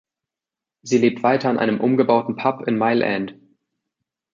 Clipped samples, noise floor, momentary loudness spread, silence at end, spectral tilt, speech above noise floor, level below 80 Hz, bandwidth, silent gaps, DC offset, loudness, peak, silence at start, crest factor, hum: under 0.1%; -88 dBFS; 7 LU; 1 s; -6 dB/octave; 69 dB; -66 dBFS; 7.6 kHz; none; under 0.1%; -19 LUFS; -2 dBFS; 0.85 s; 18 dB; none